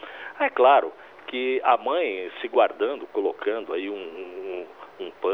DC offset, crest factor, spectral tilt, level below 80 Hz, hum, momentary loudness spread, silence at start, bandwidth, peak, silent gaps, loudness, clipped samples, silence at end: under 0.1%; 20 dB; -5 dB/octave; -78 dBFS; none; 18 LU; 0 s; 5.4 kHz; -4 dBFS; none; -24 LUFS; under 0.1%; 0 s